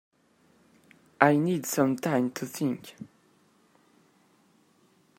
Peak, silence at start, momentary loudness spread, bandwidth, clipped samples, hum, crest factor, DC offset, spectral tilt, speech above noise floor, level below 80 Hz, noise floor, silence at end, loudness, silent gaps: 0 dBFS; 1.2 s; 23 LU; 16 kHz; under 0.1%; none; 30 dB; under 0.1%; -5.5 dB/octave; 38 dB; -76 dBFS; -65 dBFS; 2.1 s; -27 LUFS; none